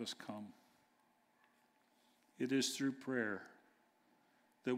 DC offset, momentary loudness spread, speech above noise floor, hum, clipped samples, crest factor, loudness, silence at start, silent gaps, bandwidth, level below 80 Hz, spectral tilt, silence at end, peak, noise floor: under 0.1%; 16 LU; 35 dB; none; under 0.1%; 20 dB; -41 LUFS; 0 s; none; 16 kHz; under -90 dBFS; -3.5 dB/octave; 0 s; -26 dBFS; -76 dBFS